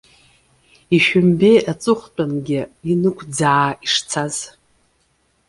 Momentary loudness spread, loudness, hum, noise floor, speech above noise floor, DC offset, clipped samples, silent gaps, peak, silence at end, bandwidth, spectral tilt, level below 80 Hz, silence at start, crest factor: 10 LU; -17 LUFS; none; -63 dBFS; 46 dB; under 0.1%; under 0.1%; none; -2 dBFS; 1 s; 11.5 kHz; -5 dB/octave; -54 dBFS; 0.9 s; 16 dB